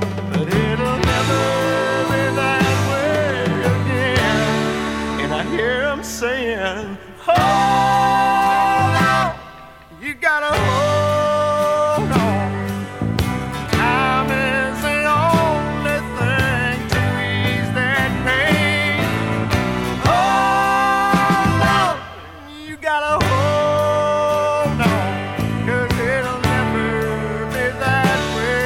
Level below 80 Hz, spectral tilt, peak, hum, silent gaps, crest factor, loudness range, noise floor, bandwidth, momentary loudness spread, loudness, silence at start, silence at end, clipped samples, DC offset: -36 dBFS; -5.5 dB/octave; -2 dBFS; none; none; 16 dB; 3 LU; -40 dBFS; 16.5 kHz; 7 LU; -18 LUFS; 0 s; 0 s; under 0.1%; under 0.1%